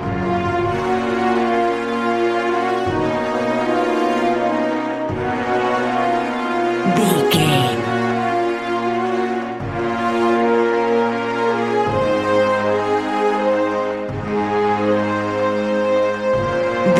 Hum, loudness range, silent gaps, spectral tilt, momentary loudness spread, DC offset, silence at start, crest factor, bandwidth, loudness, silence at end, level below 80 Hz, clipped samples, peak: none; 1 LU; none; -5.5 dB/octave; 5 LU; under 0.1%; 0 s; 16 dB; 15.5 kHz; -18 LUFS; 0 s; -46 dBFS; under 0.1%; -2 dBFS